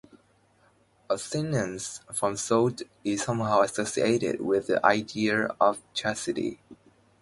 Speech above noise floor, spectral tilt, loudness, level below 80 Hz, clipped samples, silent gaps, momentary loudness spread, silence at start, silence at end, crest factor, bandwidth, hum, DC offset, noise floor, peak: 37 dB; -4.5 dB/octave; -27 LUFS; -62 dBFS; under 0.1%; none; 9 LU; 1.1 s; 0.5 s; 24 dB; 11.5 kHz; none; under 0.1%; -64 dBFS; -4 dBFS